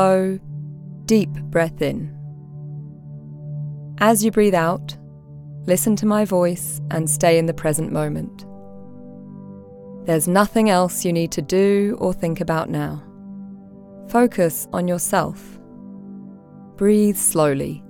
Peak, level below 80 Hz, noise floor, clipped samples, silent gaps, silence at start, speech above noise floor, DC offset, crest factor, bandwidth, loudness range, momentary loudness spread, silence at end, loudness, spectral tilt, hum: -2 dBFS; -48 dBFS; -41 dBFS; under 0.1%; none; 0 s; 23 dB; under 0.1%; 18 dB; 19.5 kHz; 4 LU; 23 LU; 0 s; -19 LUFS; -5.5 dB/octave; none